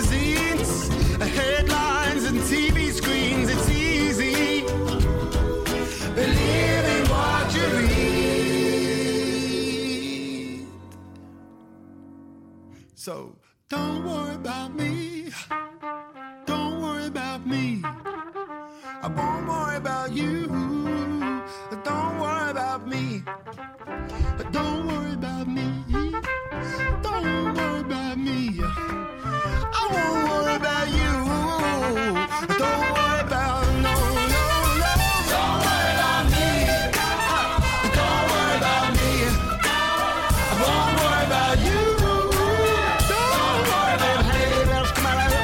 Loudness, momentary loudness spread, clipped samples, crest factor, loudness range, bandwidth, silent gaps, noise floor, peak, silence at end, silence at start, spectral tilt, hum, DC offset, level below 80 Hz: -23 LUFS; 11 LU; under 0.1%; 12 dB; 10 LU; 16.5 kHz; none; -48 dBFS; -10 dBFS; 0 s; 0 s; -4.5 dB/octave; none; under 0.1%; -30 dBFS